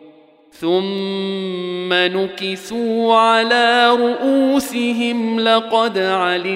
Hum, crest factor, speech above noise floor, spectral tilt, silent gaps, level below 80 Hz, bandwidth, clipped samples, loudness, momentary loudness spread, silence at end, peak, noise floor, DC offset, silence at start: none; 14 dB; 31 dB; -4.5 dB/octave; none; -62 dBFS; 16 kHz; under 0.1%; -16 LUFS; 10 LU; 0 s; -2 dBFS; -47 dBFS; under 0.1%; 0.05 s